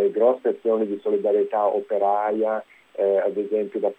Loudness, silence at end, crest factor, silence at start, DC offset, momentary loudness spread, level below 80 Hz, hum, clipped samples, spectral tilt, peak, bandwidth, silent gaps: -23 LUFS; 0.05 s; 16 dB; 0 s; under 0.1%; 5 LU; -80 dBFS; none; under 0.1%; -8 dB/octave; -6 dBFS; 3.9 kHz; none